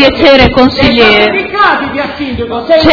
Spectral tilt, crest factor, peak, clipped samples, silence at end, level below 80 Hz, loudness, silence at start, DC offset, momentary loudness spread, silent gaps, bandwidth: -6 dB/octave; 8 dB; 0 dBFS; 5%; 0 s; -26 dBFS; -7 LUFS; 0 s; under 0.1%; 11 LU; none; 5.4 kHz